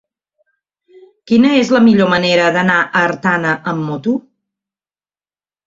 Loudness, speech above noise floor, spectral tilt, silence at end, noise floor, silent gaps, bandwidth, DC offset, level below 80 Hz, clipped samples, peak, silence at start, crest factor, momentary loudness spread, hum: -13 LUFS; over 77 dB; -6 dB/octave; 1.45 s; under -90 dBFS; none; 7.6 kHz; under 0.1%; -56 dBFS; under 0.1%; -2 dBFS; 1.25 s; 14 dB; 9 LU; 50 Hz at -40 dBFS